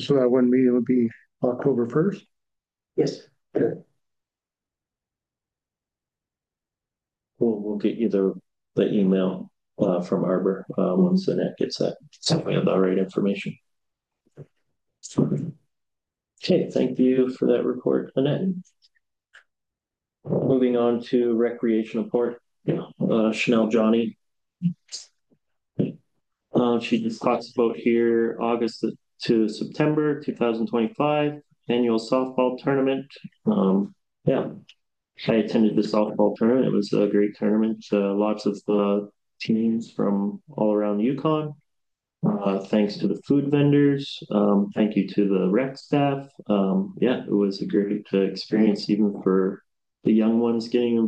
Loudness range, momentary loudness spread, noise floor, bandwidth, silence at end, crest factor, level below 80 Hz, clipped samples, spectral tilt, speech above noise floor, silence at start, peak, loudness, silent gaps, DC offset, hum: 6 LU; 9 LU; under -90 dBFS; 9 kHz; 0 s; 18 dB; -68 dBFS; under 0.1%; -7.5 dB/octave; over 68 dB; 0 s; -6 dBFS; -23 LUFS; none; under 0.1%; none